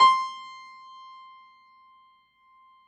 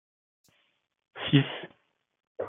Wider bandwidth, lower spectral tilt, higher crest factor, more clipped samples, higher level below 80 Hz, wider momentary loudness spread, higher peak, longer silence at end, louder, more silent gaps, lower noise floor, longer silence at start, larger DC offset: first, 9 kHz vs 3.9 kHz; second, 0.5 dB/octave vs -8.5 dB/octave; about the same, 22 dB vs 24 dB; neither; second, under -90 dBFS vs -70 dBFS; about the same, 24 LU vs 25 LU; about the same, -6 dBFS vs -8 dBFS; first, 2.35 s vs 0 s; about the same, -25 LUFS vs -27 LUFS; second, none vs 2.27-2.35 s; second, -61 dBFS vs -72 dBFS; second, 0 s vs 1.15 s; neither